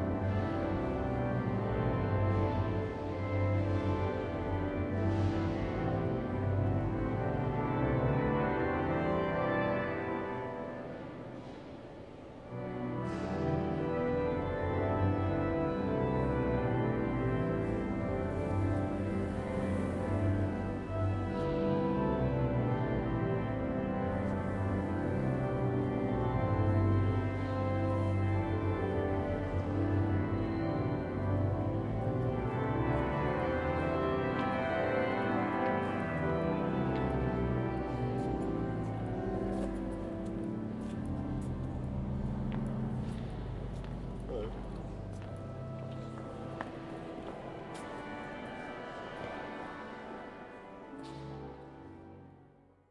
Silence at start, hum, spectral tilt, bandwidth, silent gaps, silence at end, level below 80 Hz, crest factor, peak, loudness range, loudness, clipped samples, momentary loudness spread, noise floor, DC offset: 0 s; none; -9 dB/octave; 10.5 kHz; none; 0.45 s; -48 dBFS; 14 dB; -18 dBFS; 10 LU; -34 LUFS; under 0.1%; 12 LU; -62 dBFS; under 0.1%